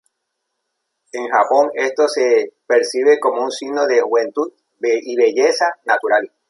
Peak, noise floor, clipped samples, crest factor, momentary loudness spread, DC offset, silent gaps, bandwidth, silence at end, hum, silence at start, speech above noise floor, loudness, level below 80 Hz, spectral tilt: -2 dBFS; -75 dBFS; under 0.1%; 16 dB; 8 LU; under 0.1%; none; 11.5 kHz; 0.25 s; none; 1.15 s; 59 dB; -17 LUFS; -74 dBFS; -2 dB/octave